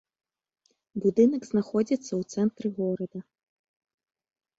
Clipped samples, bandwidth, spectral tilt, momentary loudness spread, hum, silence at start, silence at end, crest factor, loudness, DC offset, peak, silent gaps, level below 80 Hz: under 0.1%; 8 kHz; -7.5 dB/octave; 13 LU; none; 0.95 s; 1.4 s; 20 dB; -27 LUFS; under 0.1%; -10 dBFS; none; -70 dBFS